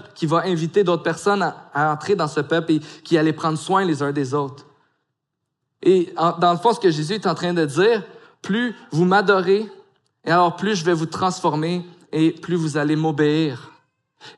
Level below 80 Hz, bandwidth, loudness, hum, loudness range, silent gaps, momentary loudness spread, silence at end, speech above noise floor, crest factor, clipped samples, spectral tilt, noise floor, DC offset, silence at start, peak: -74 dBFS; 11.5 kHz; -20 LUFS; none; 2 LU; none; 6 LU; 0.05 s; 59 dB; 16 dB; under 0.1%; -6 dB/octave; -79 dBFS; under 0.1%; 0.15 s; -4 dBFS